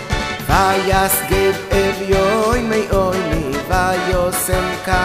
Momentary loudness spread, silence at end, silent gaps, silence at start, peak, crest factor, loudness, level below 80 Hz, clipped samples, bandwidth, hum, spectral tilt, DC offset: 5 LU; 0 s; none; 0 s; 0 dBFS; 16 dB; -16 LUFS; -26 dBFS; under 0.1%; 15.5 kHz; none; -4.5 dB/octave; under 0.1%